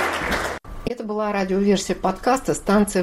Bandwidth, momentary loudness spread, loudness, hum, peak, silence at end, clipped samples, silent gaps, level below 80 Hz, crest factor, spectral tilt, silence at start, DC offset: 16 kHz; 10 LU; -22 LUFS; none; -8 dBFS; 0 s; under 0.1%; none; -40 dBFS; 14 dB; -5 dB/octave; 0 s; under 0.1%